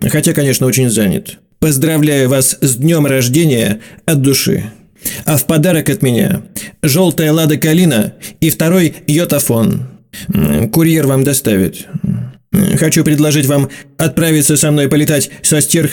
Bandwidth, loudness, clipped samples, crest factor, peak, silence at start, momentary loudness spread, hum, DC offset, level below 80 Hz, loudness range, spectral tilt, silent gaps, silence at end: 19 kHz; -12 LUFS; under 0.1%; 12 dB; 0 dBFS; 0 s; 9 LU; none; under 0.1%; -42 dBFS; 2 LU; -5 dB/octave; none; 0 s